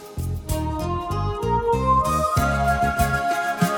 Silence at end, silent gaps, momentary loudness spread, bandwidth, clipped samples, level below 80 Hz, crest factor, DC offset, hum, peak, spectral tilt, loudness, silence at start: 0 s; none; 7 LU; over 20 kHz; under 0.1%; -32 dBFS; 16 dB; under 0.1%; none; -6 dBFS; -6 dB/octave; -22 LUFS; 0 s